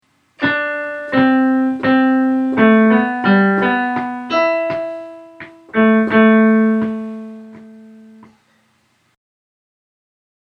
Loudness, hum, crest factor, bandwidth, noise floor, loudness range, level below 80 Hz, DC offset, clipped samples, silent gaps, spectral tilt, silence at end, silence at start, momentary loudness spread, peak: -15 LUFS; none; 16 dB; 6 kHz; -60 dBFS; 4 LU; -58 dBFS; under 0.1%; under 0.1%; none; -8 dB/octave; 2.7 s; 0.4 s; 16 LU; 0 dBFS